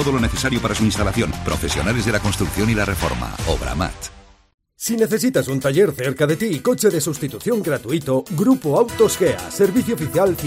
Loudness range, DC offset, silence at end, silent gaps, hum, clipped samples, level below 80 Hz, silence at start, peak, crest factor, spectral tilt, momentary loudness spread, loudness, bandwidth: 3 LU; under 0.1%; 0 s; 4.54-4.58 s; none; under 0.1%; -34 dBFS; 0 s; -2 dBFS; 16 dB; -5 dB/octave; 7 LU; -19 LUFS; 16 kHz